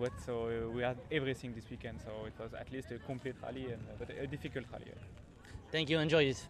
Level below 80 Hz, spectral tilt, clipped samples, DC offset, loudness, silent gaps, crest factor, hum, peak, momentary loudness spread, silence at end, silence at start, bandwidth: -58 dBFS; -5.5 dB/octave; under 0.1%; under 0.1%; -39 LUFS; none; 22 dB; none; -16 dBFS; 17 LU; 0 s; 0 s; 13.5 kHz